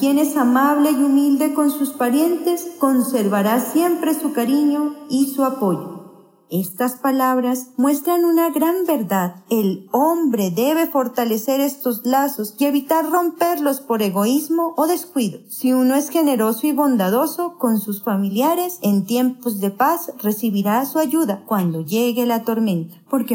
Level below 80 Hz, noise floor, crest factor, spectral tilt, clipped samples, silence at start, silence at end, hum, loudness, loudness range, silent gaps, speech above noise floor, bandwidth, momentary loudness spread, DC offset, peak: -82 dBFS; -44 dBFS; 14 dB; -5.5 dB/octave; under 0.1%; 0 s; 0 s; none; -19 LUFS; 2 LU; none; 26 dB; 16.5 kHz; 6 LU; under 0.1%; -4 dBFS